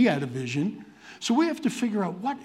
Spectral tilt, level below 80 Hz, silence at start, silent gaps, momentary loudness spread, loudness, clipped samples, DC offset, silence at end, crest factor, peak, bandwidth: -5.5 dB/octave; -74 dBFS; 0 s; none; 10 LU; -27 LUFS; under 0.1%; under 0.1%; 0 s; 18 dB; -8 dBFS; 13.5 kHz